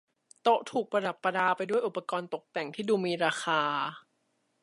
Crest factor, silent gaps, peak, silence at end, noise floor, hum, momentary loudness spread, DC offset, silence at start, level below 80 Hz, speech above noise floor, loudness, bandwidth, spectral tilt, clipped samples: 18 dB; none; -14 dBFS; 0.65 s; -76 dBFS; none; 8 LU; under 0.1%; 0.45 s; -82 dBFS; 46 dB; -30 LUFS; 11.5 kHz; -4.5 dB/octave; under 0.1%